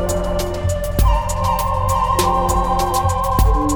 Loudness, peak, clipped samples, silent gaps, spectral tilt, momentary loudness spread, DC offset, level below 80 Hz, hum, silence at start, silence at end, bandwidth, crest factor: -18 LUFS; -2 dBFS; under 0.1%; none; -5.5 dB/octave; 5 LU; under 0.1%; -20 dBFS; none; 0 s; 0 s; over 20 kHz; 14 dB